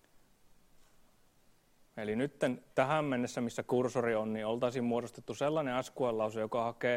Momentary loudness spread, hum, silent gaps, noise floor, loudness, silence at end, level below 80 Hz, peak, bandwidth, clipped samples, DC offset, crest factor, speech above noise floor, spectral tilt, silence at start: 6 LU; none; none; -67 dBFS; -34 LUFS; 0 s; -70 dBFS; -14 dBFS; 16 kHz; under 0.1%; under 0.1%; 20 dB; 33 dB; -6 dB/octave; 1.95 s